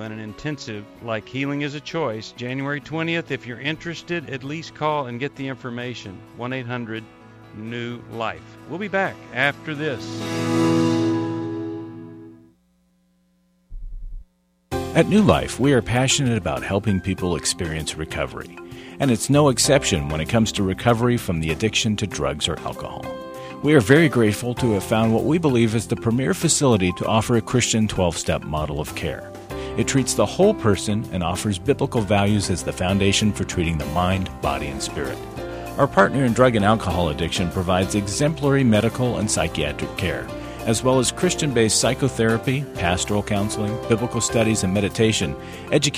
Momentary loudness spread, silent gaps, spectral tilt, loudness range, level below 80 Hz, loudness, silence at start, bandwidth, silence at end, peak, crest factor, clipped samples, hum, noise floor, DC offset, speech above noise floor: 14 LU; none; -4.5 dB/octave; 8 LU; -42 dBFS; -21 LUFS; 0 s; 16 kHz; 0 s; 0 dBFS; 22 dB; under 0.1%; none; -63 dBFS; under 0.1%; 42 dB